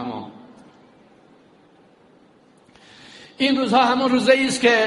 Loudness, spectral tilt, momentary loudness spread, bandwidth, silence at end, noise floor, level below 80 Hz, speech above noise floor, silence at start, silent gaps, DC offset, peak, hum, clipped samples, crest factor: -18 LUFS; -3.5 dB/octave; 24 LU; 11.5 kHz; 0 s; -54 dBFS; -64 dBFS; 37 dB; 0 s; none; under 0.1%; -2 dBFS; none; under 0.1%; 20 dB